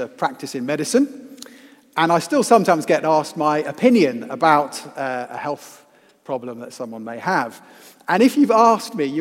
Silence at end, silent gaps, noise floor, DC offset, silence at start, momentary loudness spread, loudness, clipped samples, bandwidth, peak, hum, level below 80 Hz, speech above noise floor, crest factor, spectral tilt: 0 s; none; -46 dBFS; under 0.1%; 0 s; 16 LU; -19 LUFS; under 0.1%; 16.5 kHz; 0 dBFS; none; -76 dBFS; 27 dB; 20 dB; -5 dB/octave